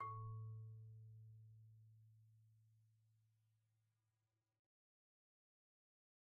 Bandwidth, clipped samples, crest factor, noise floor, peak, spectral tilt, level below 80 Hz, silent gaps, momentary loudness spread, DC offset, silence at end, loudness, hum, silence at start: 1.2 kHz; under 0.1%; 18 dB; under -90 dBFS; -42 dBFS; -4 dB/octave; -82 dBFS; none; 16 LU; under 0.1%; 3 s; -57 LUFS; none; 0 s